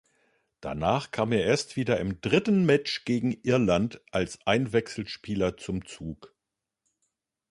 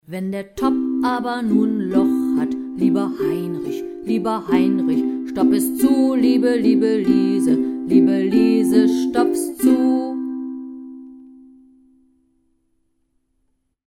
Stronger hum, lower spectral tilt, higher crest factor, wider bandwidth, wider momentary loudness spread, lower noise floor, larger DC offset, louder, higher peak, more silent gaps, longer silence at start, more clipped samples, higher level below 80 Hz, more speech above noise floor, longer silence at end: neither; about the same, -6 dB/octave vs -6 dB/octave; about the same, 20 dB vs 16 dB; second, 11.5 kHz vs 15.5 kHz; about the same, 13 LU vs 11 LU; first, -87 dBFS vs -68 dBFS; neither; second, -27 LUFS vs -18 LUFS; second, -8 dBFS vs -2 dBFS; neither; first, 0.6 s vs 0.1 s; neither; about the same, -52 dBFS vs -54 dBFS; first, 60 dB vs 51 dB; second, 1.25 s vs 2.6 s